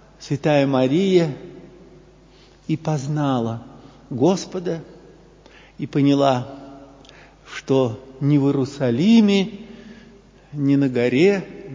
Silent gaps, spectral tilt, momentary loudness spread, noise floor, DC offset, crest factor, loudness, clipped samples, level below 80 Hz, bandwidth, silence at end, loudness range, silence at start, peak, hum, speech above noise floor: none; -7 dB/octave; 18 LU; -49 dBFS; under 0.1%; 18 dB; -20 LUFS; under 0.1%; -54 dBFS; 7.6 kHz; 0 s; 5 LU; 0.2 s; -4 dBFS; none; 31 dB